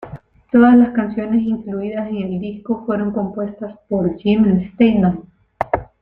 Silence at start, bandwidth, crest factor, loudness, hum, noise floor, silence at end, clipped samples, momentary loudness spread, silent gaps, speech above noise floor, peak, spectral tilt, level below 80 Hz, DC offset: 0 s; 4.2 kHz; 16 dB; -17 LUFS; none; -37 dBFS; 0.15 s; under 0.1%; 14 LU; none; 21 dB; 0 dBFS; -10.5 dB/octave; -46 dBFS; under 0.1%